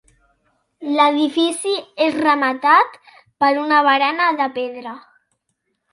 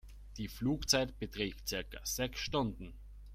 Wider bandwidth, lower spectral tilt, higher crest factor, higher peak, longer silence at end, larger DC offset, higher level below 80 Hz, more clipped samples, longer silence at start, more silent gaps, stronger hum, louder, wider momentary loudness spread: second, 11.5 kHz vs 16 kHz; second, -2 dB/octave vs -3.5 dB/octave; about the same, 18 dB vs 22 dB; first, -2 dBFS vs -16 dBFS; first, 0.95 s vs 0 s; neither; second, -70 dBFS vs -50 dBFS; neither; first, 0.8 s vs 0.05 s; neither; neither; first, -17 LUFS vs -36 LUFS; second, 12 LU vs 19 LU